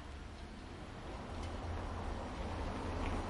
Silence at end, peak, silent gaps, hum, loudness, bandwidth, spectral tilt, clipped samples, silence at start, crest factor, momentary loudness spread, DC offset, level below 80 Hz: 0 s; -26 dBFS; none; none; -45 LUFS; 11.5 kHz; -6 dB/octave; under 0.1%; 0 s; 16 dB; 9 LU; under 0.1%; -46 dBFS